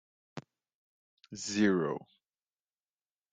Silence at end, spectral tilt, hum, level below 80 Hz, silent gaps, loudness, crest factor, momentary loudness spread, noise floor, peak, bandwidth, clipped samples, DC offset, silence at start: 1.3 s; -5 dB/octave; none; -78 dBFS; 0.74-1.17 s; -32 LUFS; 22 dB; 22 LU; under -90 dBFS; -16 dBFS; 9.4 kHz; under 0.1%; under 0.1%; 0.35 s